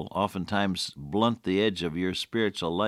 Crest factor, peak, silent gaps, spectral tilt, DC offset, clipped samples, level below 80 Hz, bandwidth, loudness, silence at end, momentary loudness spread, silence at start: 18 dB; -10 dBFS; none; -5 dB/octave; under 0.1%; under 0.1%; -60 dBFS; 15 kHz; -28 LUFS; 0 s; 4 LU; 0 s